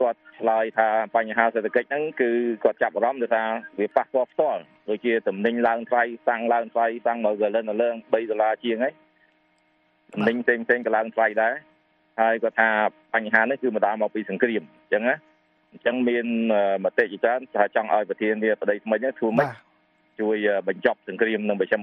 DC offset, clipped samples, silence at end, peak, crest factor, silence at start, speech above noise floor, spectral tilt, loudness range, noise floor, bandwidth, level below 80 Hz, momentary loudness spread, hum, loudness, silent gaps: under 0.1%; under 0.1%; 0 s; -2 dBFS; 22 dB; 0 s; 42 dB; -8 dB/octave; 2 LU; -65 dBFS; 5.8 kHz; -74 dBFS; 5 LU; none; -23 LUFS; none